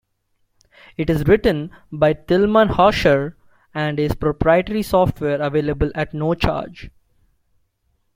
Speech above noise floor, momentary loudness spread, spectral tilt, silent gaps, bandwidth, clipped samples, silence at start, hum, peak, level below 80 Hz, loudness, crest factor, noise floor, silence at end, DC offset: 49 dB; 12 LU; -7 dB/octave; none; 16 kHz; under 0.1%; 1 s; none; -2 dBFS; -36 dBFS; -18 LUFS; 18 dB; -67 dBFS; 1.25 s; under 0.1%